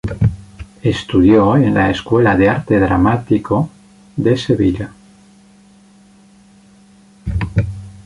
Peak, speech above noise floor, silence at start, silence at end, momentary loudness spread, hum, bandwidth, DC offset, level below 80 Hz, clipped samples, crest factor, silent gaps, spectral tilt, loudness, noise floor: -2 dBFS; 33 dB; 0.05 s; 0.1 s; 14 LU; none; 11 kHz; under 0.1%; -32 dBFS; under 0.1%; 14 dB; none; -8 dB/octave; -15 LUFS; -46 dBFS